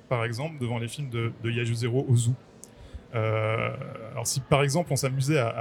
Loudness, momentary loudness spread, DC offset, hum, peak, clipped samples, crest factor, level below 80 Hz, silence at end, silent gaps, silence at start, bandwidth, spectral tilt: -28 LUFS; 11 LU; under 0.1%; none; -6 dBFS; under 0.1%; 22 dB; -56 dBFS; 0 s; none; 0.1 s; 16.5 kHz; -5.5 dB/octave